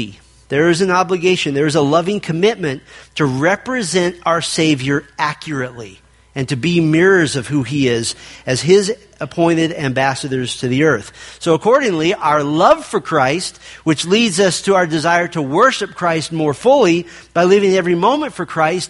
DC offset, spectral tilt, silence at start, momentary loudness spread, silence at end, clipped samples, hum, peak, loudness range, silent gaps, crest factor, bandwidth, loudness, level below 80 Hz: under 0.1%; -5 dB/octave; 0 s; 10 LU; 0 s; under 0.1%; none; 0 dBFS; 3 LU; none; 16 dB; 11.5 kHz; -15 LUFS; -50 dBFS